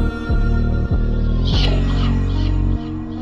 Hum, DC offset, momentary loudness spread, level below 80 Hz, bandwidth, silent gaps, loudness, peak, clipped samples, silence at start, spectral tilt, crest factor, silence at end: none; under 0.1%; 4 LU; -20 dBFS; 7.2 kHz; none; -20 LUFS; -6 dBFS; under 0.1%; 0 s; -7.5 dB/octave; 10 dB; 0 s